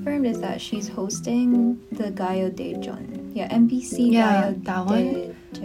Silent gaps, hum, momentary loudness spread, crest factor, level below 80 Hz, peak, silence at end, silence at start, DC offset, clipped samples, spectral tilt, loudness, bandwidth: none; none; 12 LU; 16 dB; -56 dBFS; -6 dBFS; 0 s; 0 s; under 0.1%; under 0.1%; -5.5 dB/octave; -23 LUFS; 13.5 kHz